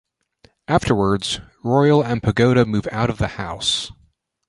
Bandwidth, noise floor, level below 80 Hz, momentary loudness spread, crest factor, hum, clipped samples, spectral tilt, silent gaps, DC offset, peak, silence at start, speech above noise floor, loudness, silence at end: 11.5 kHz; -60 dBFS; -42 dBFS; 9 LU; 18 dB; none; under 0.1%; -5.5 dB/octave; none; under 0.1%; -2 dBFS; 0.7 s; 41 dB; -19 LUFS; 0.6 s